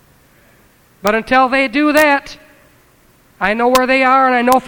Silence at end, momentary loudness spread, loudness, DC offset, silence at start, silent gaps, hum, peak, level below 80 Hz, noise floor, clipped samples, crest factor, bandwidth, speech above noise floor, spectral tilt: 0 s; 7 LU; -13 LUFS; under 0.1%; 1.05 s; none; none; 0 dBFS; -46 dBFS; -50 dBFS; under 0.1%; 14 dB; over 20 kHz; 38 dB; -3.5 dB/octave